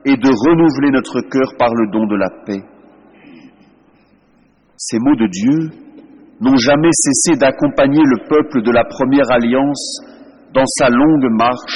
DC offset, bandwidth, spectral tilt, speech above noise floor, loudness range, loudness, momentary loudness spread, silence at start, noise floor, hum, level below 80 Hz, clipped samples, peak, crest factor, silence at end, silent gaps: under 0.1%; 11.5 kHz; -4.5 dB/octave; 40 dB; 8 LU; -13 LUFS; 9 LU; 0.05 s; -53 dBFS; none; -46 dBFS; under 0.1%; -2 dBFS; 12 dB; 0 s; none